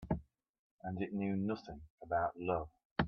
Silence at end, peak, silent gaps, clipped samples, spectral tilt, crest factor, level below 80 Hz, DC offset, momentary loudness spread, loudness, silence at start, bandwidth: 0 s; -16 dBFS; 0.49-0.79 s, 1.90-1.98 s, 2.85-2.96 s; under 0.1%; -6 dB/octave; 22 dB; -58 dBFS; under 0.1%; 11 LU; -39 LUFS; 0 s; 6.4 kHz